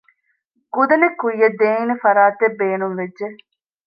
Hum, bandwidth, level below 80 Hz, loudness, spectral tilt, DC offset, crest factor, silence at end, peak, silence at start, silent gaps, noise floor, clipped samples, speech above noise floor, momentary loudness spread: none; 5.2 kHz; -72 dBFS; -17 LUFS; -9 dB/octave; under 0.1%; 16 dB; 0.5 s; -2 dBFS; 0.75 s; none; -68 dBFS; under 0.1%; 51 dB; 13 LU